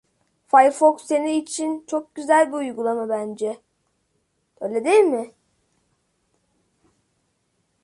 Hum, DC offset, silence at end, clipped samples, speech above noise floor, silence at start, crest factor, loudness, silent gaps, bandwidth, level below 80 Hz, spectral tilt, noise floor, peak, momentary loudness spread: none; under 0.1%; 2.55 s; under 0.1%; 51 dB; 0.55 s; 20 dB; -21 LUFS; none; 11.5 kHz; -74 dBFS; -3.5 dB/octave; -70 dBFS; -2 dBFS; 13 LU